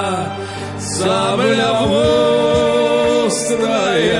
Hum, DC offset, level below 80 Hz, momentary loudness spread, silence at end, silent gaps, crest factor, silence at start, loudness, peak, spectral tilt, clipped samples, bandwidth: none; under 0.1%; -44 dBFS; 9 LU; 0 s; none; 12 dB; 0 s; -15 LUFS; -2 dBFS; -4 dB/octave; under 0.1%; 11.5 kHz